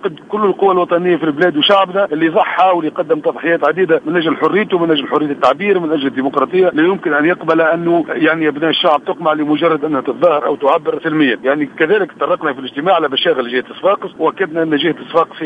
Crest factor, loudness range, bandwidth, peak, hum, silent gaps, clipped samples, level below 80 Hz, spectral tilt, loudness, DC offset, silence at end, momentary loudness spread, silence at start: 14 dB; 2 LU; 7.4 kHz; 0 dBFS; none; none; under 0.1%; -62 dBFS; -7 dB/octave; -14 LUFS; under 0.1%; 0 s; 5 LU; 0 s